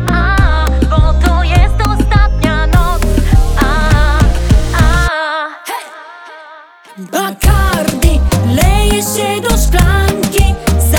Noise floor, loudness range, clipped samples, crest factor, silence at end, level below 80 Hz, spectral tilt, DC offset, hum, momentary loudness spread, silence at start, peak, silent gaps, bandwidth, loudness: -36 dBFS; 4 LU; under 0.1%; 10 dB; 0 s; -12 dBFS; -5 dB/octave; under 0.1%; none; 9 LU; 0 s; 0 dBFS; none; 19 kHz; -12 LUFS